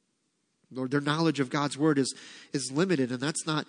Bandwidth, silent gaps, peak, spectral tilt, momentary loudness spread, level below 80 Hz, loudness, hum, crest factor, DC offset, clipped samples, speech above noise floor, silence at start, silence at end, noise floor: 10.5 kHz; none; -12 dBFS; -5 dB/octave; 10 LU; -80 dBFS; -29 LUFS; none; 18 dB; under 0.1%; under 0.1%; 48 dB; 0.7 s; 0.05 s; -76 dBFS